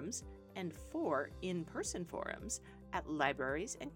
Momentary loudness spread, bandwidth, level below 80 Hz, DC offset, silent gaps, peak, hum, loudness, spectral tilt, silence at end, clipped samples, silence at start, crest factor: 10 LU; 18 kHz; -58 dBFS; under 0.1%; none; -18 dBFS; none; -41 LUFS; -4 dB/octave; 0 s; under 0.1%; 0 s; 24 dB